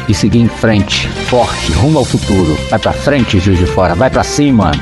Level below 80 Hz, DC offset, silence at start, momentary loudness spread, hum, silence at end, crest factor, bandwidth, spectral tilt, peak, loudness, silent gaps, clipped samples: -24 dBFS; under 0.1%; 0 s; 3 LU; none; 0 s; 10 dB; 12 kHz; -5.5 dB/octave; 0 dBFS; -11 LUFS; none; under 0.1%